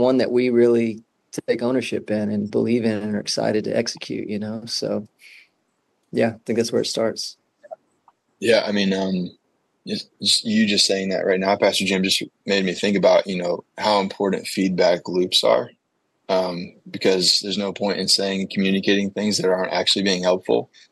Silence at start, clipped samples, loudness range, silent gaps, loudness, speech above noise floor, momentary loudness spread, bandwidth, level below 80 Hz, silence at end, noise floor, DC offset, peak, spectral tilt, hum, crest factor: 0 s; under 0.1%; 6 LU; none; -21 LUFS; 50 dB; 11 LU; 12.5 kHz; -70 dBFS; 0.25 s; -71 dBFS; under 0.1%; -4 dBFS; -4 dB/octave; none; 18 dB